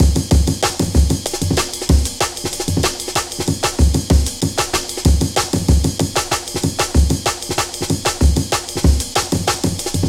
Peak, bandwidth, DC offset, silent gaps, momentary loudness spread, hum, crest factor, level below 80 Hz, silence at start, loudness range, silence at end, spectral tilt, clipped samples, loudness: 0 dBFS; 16.5 kHz; under 0.1%; none; 4 LU; none; 16 dB; -20 dBFS; 0 s; 1 LU; 0 s; -4.5 dB/octave; under 0.1%; -17 LUFS